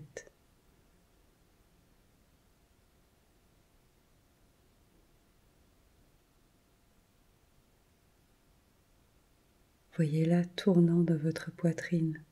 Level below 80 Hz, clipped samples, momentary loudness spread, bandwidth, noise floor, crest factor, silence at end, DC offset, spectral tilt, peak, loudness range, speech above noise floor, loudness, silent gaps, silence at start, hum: -70 dBFS; under 0.1%; 14 LU; 12 kHz; -68 dBFS; 20 dB; 0.1 s; under 0.1%; -8 dB/octave; -16 dBFS; 17 LU; 38 dB; -30 LUFS; none; 0 s; none